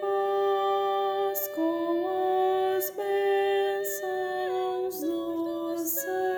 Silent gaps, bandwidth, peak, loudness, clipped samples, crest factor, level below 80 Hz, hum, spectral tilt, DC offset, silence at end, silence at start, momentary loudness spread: none; over 20 kHz; -16 dBFS; -28 LUFS; under 0.1%; 12 dB; -72 dBFS; none; -3 dB/octave; under 0.1%; 0 s; 0 s; 5 LU